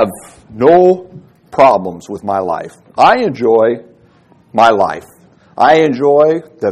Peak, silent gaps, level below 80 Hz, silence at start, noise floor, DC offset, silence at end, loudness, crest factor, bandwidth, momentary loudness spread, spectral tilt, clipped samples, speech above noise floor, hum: 0 dBFS; none; -52 dBFS; 0 s; -47 dBFS; under 0.1%; 0 s; -12 LUFS; 12 dB; 13.5 kHz; 13 LU; -6 dB/octave; 0.5%; 36 dB; none